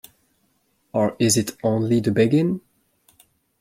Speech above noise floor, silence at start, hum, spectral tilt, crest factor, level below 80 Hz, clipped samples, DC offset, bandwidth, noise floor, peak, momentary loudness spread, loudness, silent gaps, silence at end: 47 dB; 0.95 s; none; -5.5 dB/octave; 18 dB; -60 dBFS; under 0.1%; under 0.1%; 16.5 kHz; -67 dBFS; -6 dBFS; 7 LU; -21 LUFS; none; 1 s